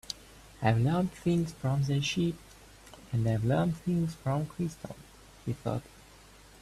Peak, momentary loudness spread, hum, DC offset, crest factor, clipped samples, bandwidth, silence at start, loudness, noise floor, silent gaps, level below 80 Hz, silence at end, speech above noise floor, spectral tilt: -12 dBFS; 17 LU; none; under 0.1%; 20 dB; under 0.1%; 14 kHz; 0.1 s; -31 LUFS; -55 dBFS; none; -54 dBFS; 0.8 s; 25 dB; -6.5 dB/octave